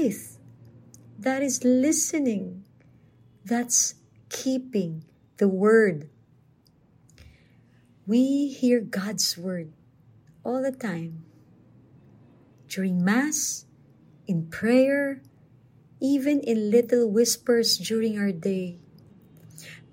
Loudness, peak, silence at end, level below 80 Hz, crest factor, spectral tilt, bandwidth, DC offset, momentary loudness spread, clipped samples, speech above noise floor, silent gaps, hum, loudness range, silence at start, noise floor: -24 LUFS; -8 dBFS; 0.15 s; -70 dBFS; 18 dB; -4 dB/octave; 16 kHz; under 0.1%; 17 LU; under 0.1%; 36 dB; none; none; 6 LU; 0 s; -60 dBFS